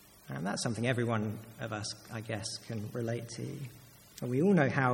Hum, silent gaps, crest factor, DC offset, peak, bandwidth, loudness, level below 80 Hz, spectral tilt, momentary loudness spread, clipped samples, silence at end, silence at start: none; none; 22 dB; under 0.1%; -12 dBFS; 17 kHz; -34 LUFS; -68 dBFS; -5.5 dB/octave; 15 LU; under 0.1%; 0 s; 0.25 s